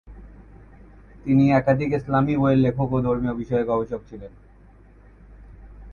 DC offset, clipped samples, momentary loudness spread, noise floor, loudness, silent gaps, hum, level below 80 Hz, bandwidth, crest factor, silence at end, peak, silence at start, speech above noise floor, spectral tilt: under 0.1%; under 0.1%; 15 LU; -50 dBFS; -21 LUFS; none; none; -44 dBFS; 6.8 kHz; 18 dB; 0 s; -6 dBFS; 0.05 s; 29 dB; -9.5 dB/octave